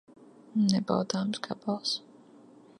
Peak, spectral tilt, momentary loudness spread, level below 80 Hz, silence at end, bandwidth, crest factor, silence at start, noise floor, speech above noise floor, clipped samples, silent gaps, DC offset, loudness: -12 dBFS; -5 dB/octave; 8 LU; -70 dBFS; 0.8 s; 11.5 kHz; 20 dB; 0.5 s; -55 dBFS; 26 dB; under 0.1%; none; under 0.1%; -30 LUFS